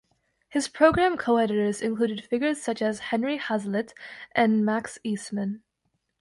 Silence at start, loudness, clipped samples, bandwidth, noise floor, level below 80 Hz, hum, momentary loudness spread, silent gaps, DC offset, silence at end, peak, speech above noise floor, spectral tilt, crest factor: 0.5 s; -26 LUFS; under 0.1%; 11.5 kHz; -76 dBFS; -56 dBFS; none; 11 LU; none; under 0.1%; 0.6 s; -6 dBFS; 51 dB; -5 dB/octave; 20 dB